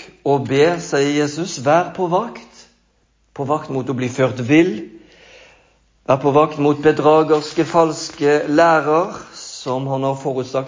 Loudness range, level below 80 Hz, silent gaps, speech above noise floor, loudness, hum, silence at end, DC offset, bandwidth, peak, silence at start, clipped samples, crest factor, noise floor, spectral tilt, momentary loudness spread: 6 LU; -58 dBFS; none; 44 dB; -17 LUFS; none; 0 s; under 0.1%; 7.6 kHz; -2 dBFS; 0 s; under 0.1%; 16 dB; -60 dBFS; -5.5 dB/octave; 13 LU